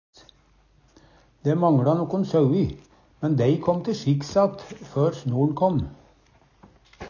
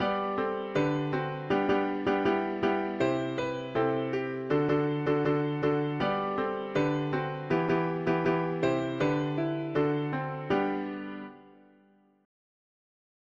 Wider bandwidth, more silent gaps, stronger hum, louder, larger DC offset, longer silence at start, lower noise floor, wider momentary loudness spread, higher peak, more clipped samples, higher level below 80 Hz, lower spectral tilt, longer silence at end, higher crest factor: about the same, 7.2 kHz vs 7.4 kHz; neither; neither; first, -23 LUFS vs -29 LUFS; neither; first, 1.45 s vs 0 s; second, -59 dBFS vs -63 dBFS; first, 10 LU vs 5 LU; first, -8 dBFS vs -16 dBFS; neither; first, -50 dBFS vs -60 dBFS; about the same, -8.5 dB/octave vs -7.5 dB/octave; second, 0 s vs 1.75 s; about the same, 16 dB vs 14 dB